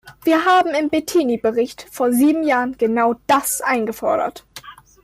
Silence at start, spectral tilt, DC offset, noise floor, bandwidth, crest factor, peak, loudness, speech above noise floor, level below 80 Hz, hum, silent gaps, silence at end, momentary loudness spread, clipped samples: 0.05 s; -3.5 dB/octave; under 0.1%; -40 dBFS; 16 kHz; 12 dB; -6 dBFS; -18 LUFS; 23 dB; -56 dBFS; none; none; 0.3 s; 9 LU; under 0.1%